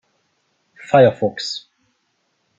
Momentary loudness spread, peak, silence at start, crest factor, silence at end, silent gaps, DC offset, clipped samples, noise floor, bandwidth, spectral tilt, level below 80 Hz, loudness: 14 LU; -2 dBFS; 0.9 s; 18 dB; 1 s; none; under 0.1%; under 0.1%; -68 dBFS; 7.8 kHz; -5.5 dB/octave; -62 dBFS; -17 LUFS